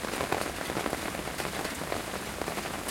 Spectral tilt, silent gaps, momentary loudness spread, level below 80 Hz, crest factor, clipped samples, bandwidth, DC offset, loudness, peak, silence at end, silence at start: -3 dB/octave; none; 3 LU; -50 dBFS; 24 dB; under 0.1%; 17 kHz; under 0.1%; -33 LUFS; -8 dBFS; 0 s; 0 s